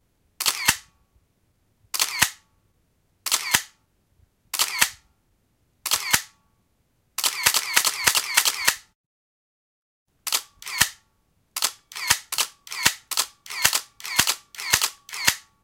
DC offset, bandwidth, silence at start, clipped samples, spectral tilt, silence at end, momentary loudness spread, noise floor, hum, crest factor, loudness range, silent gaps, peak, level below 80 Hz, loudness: under 0.1%; 17 kHz; 0.4 s; under 0.1%; 1 dB/octave; 0.25 s; 11 LU; -68 dBFS; none; 26 dB; 4 LU; 8.95-10.06 s; 0 dBFS; -56 dBFS; -22 LUFS